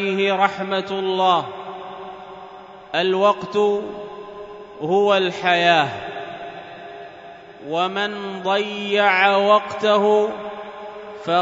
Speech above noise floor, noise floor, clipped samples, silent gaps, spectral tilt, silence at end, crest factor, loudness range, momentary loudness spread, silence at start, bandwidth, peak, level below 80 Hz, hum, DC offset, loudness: 22 dB; -40 dBFS; under 0.1%; none; -5 dB/octave; 0 s; 20 dB; 5 LU; 21 LU; 0 s; 7.8 kHz; 0 dBFS; -64 dBFS; none; under 0.1%; -19 LUFS